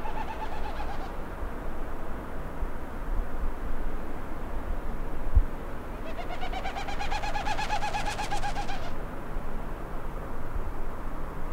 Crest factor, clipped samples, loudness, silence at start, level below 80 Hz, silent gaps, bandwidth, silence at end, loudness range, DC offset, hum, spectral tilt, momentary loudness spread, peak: 18 dB; under 0.1%; -36 LUFS; 0 s; -32 dBFS; none; 9.8 kHz; 0 s; 5 LU; under 0.1%; none; -5 dB/octave; 8 LU; -10 dBFS